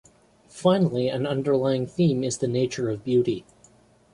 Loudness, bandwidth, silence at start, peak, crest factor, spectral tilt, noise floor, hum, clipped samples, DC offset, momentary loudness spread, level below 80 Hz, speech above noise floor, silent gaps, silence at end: -24 LUFS; 11 kHz; 0.55 s; -8 dBFS; 16 dB; -6.5 dB/octave; -57 dBFS; none; under 0.1%; under 0.1%; 5 LU; -60 dBFS; 34 dB; none; 0.7 s